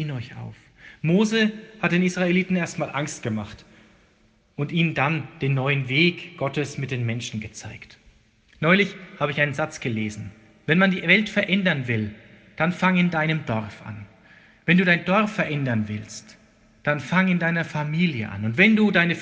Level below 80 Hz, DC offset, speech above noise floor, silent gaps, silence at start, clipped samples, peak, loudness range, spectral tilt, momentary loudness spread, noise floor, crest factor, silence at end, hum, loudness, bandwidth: -58 dBFS; under 0.1%; 37 dB; none; 0 s; under 0.1%; -2 dBFS; 4 LU; -6 dB/octave; 18 LU; -60 dBFS; 20 dB; 0 s; none; -22 LUFS; 9 kHz